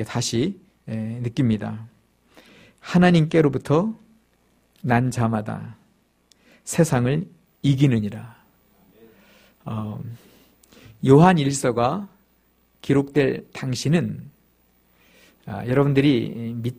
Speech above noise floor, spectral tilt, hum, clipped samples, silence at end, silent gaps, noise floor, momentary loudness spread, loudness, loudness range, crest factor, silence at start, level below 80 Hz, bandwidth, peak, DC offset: 42 dB; -6.5 dB/octave; none; under 0.1%; 0.05 s; none; -62 dBFS; 21 LU; -21 LUFS; 5 LU; 22 dB; 0 s; -52 dBFS; 15.5 kHz; -2 dBFS; under 0.1%